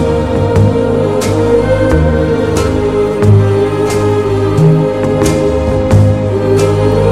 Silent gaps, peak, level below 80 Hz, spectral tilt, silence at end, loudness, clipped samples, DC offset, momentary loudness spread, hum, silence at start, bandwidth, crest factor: none; 0 dBFS; -24 dBFS; -7.5 dB/octave; 0 s; -11 LUFS; 0.6%; 1%; 3 LU; none; 0 s; 13.5 kHz; 10 dB